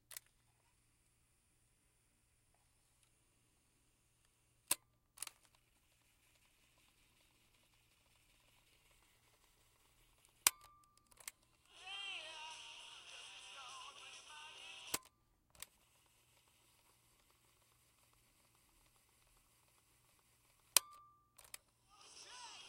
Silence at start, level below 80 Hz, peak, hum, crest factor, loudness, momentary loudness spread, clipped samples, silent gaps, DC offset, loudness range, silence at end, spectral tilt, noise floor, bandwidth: 0.1 s; -82 dBFS; -8 dBFS; none; 42 dB; -42 LUFS; 22 LU; under 0.1%; none; under 0.1%; 12 LU; 0 s; 1.5 dB/octave; -77 dBFS; 16 kHz